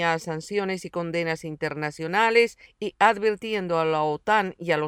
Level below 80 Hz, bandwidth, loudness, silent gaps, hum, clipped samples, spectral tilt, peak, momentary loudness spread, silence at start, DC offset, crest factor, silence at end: -62 dBFS; 13 kHz; -24 LUFS; none; none; under 0.1%; -5 dB/octave; -6 dBFS; 10 LU; 0 s; under 0.1%; 18 dB; 0 s